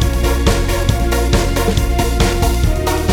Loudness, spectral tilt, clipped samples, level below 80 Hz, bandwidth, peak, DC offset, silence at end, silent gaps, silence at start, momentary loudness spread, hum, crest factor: -16 LUFS; -5 dB/octave; under 0.1%; -16 dBFS; 18 kHz; -2 dBFS; under 0.1%; 0 s; none; 0 s; 2 LU; none; 12 dB